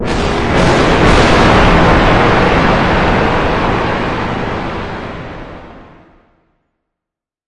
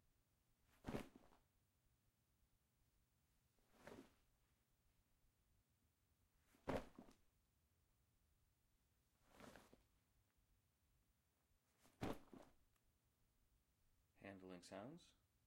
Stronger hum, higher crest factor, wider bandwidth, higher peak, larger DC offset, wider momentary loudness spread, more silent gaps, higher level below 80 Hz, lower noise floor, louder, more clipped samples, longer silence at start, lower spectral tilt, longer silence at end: neither; second, 12 dB vs 30 dB; second, 11 kHz vs 16 kHz; first, 0 dBFS vs -32 dBFS; first, 2% vs under 0.1%; about the same, 15 LU vs 16 LU; neither; first, -22 dBFS vs -76 dBFS; about the same, -84 dBFS vs -85 dBFS; first, -11 LUFS vs -57 LUFS; neither; second, 0 s vs 0.7 s; about the same, -6 dB/octave vs -6 dB/octave; second, 0 s vs 0.35 s